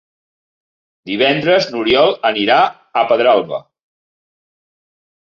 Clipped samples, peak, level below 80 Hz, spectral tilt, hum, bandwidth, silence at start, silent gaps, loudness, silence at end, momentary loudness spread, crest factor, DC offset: under 0.1%; -2 dBFS; -58 dBFS; -5 dB/octave; none; 7.2 kHz; 1.05 s; none; -14 LUFS; 1.7 s; 8 LU; 16 dB; under 0.1%